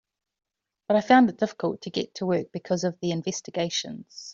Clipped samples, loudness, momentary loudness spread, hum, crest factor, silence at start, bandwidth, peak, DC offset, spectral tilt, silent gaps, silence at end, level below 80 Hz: under 0.1%; -25 LUFS; 12 LU; none; 20 dB; 0.9 s; 7.6 kHz; -6 dBFS; under 0.1%; -5 dB/octave; none; 0 s; -68 dBFS